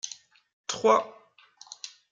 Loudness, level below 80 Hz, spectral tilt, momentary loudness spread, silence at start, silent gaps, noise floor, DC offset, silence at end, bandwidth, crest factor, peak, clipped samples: -26 LUFS; -82 dBFS; -2 dB/octave; 22 LU; 0.05 s; 0.53-0.64 s; -55 dBFS; under 0.1%; 0.25 s; 9.4 kHz; 22 dB; -8 dBFS; under 0.1%